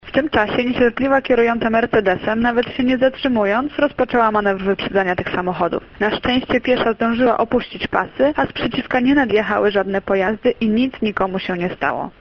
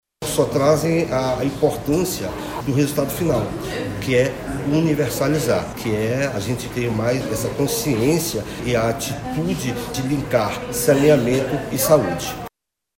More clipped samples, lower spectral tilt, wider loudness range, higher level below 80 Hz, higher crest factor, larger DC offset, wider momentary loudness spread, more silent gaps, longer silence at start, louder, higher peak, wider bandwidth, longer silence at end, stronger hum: neither; first, -7.5 dB/octave vs -5.5 dB/octave; about the same, 2 LU vs 2 LU; about the same, -44 dBFS vs -42 dBFS; about the same, 16 dB vs 20 dB; neither; second, 5 LU vs 9 LU; neither; second, 0.05 s vs 0.2 s; about the same, -18 LUFS vs -20 LUFS; about the same, 0 dBFS vs 0 dBFS; second, 6.6 kHz vs 16.5 kHz; second, 0.1 s vs 0.5 s; neither